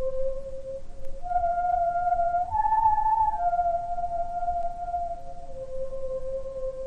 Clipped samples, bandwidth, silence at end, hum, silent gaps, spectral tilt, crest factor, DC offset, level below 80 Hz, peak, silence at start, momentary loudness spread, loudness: under 0.1%; 4.2 kHz; 0 s; none; none; -6.5 dB/octave; 14 dB; under 0.1%; -38 dBFS; -12 dBFS; 0 s; 16 LU; -27 LUFS